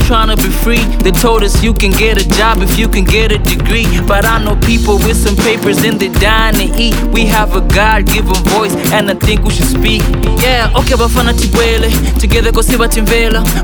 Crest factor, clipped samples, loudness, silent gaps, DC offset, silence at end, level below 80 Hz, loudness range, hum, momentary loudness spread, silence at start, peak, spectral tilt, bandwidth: 10 dB; under 0.1%; -10 LUFS; none; under 0.1%; 0 s; -12 dBFS; 0 LU; none; 2 LU; 0 s; 0 dBFS; -4.5 dB/octave; over 20 kHz